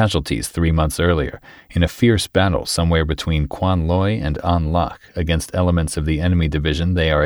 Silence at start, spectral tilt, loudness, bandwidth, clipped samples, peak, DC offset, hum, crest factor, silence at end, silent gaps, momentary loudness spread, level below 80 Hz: 0 s; -6 dB/octave; -19 LUFS; 19.5 kHz; under 0.1%; -4 dBFS; under 0.1%; none; 14 dB; 0 s; none; 5 LU; -28 dBFS